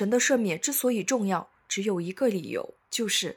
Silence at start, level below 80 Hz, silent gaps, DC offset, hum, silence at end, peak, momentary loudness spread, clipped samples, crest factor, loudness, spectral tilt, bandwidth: 0 s; -76 dBFS; none; under 0.1%; none; 0.05 s; -12 dBFS; 9 LU; under 0.1%; 14 dB; -27 LUFS; -3 dB/octave; 18.5 kHz